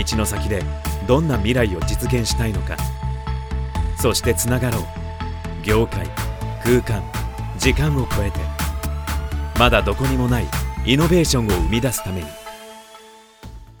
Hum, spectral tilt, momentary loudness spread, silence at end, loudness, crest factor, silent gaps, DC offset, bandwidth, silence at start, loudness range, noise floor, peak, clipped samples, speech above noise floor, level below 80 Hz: none; -5 dB/octave; 12 LU; 0.05 s; -21 LUFS; 20 dB; none; under 0.1%; over 20 kHz; 0 s; 3 LU; -44 dBFS; 0 dBFS; under 0.1%; 26 dB; -26 dBFS